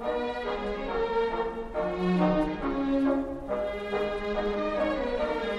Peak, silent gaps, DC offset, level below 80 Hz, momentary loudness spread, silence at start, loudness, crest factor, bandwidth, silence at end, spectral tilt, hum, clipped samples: -12 dBFS; none; under 0.1%; -44 dBFS; 6 LU; 0 s; -29 LUFS; 16 dB; 11 kHz; 0 s; -7.5 dB/octave; none; under 0.1%